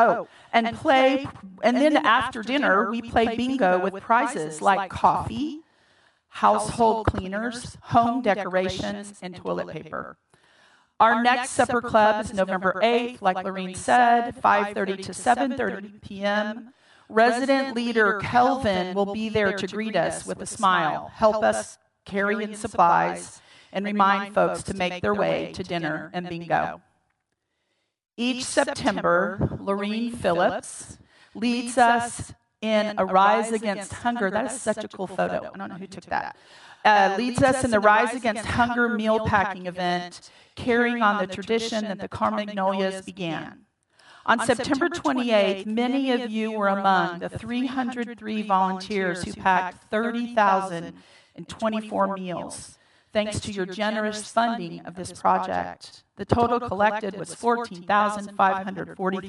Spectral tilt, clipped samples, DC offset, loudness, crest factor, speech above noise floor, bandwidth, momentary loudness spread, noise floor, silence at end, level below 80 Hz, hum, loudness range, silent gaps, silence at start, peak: -4.5 dB/octave; under 0.1%; under 0.1%; -24 LUFS; 24 dB; 53 dB; 12 kHz; 13 LU; -77 dBFS; 0 s; -54 dBFS; none; 5 LU; none; 0 s; 0 dBFS